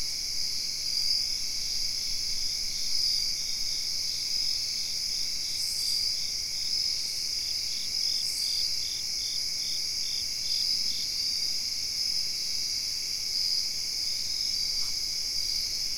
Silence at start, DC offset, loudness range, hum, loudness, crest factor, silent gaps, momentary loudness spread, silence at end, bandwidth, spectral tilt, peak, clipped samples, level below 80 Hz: 0 s; 0.7%; 0 LU; none; -27 LUFS; 16 dB; none; 3 LU; 0 s; 16.5 kHz; 1.5 dB/octave; -14 dBFS; under 0.1%; -52 dBFS